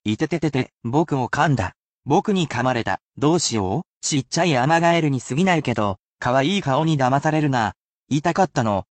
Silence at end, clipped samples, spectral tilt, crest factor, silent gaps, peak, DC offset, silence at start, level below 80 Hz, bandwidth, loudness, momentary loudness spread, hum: 0.1 s; under 0.1%; -5 dB/octave; 16 dB; 0.74-0.78 s, 1.78-2.03 s, 3.01-3.10 s, 3.88-4.01 s, 5.99-6.15 s, 7.76-8.06 s; -6 dBFS; under 0.1%; 0.05 s; -52 dBFS; 9.2 kHz; -21 LUFS; 7 LU; none